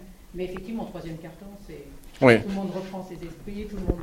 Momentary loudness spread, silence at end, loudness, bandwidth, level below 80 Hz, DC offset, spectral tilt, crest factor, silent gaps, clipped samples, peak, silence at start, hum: 25 LU; 0 s; -26 LUFS; 16 kHz; -42 dBFS; under 0.1%; -6.5 dB/octave; 26 dB; none; under 0.1%; -2 dBFS; 0 s; none